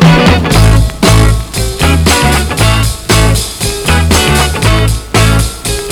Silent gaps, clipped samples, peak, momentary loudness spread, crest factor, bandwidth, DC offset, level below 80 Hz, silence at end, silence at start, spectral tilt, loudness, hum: none; 2%; 0 dBFS; 6 LU; 8 dB; over 20 kHz; under 0.1%; -14 dBFS; 0 s; 0 s; -4.5 dB/octave; -9 LUFS; none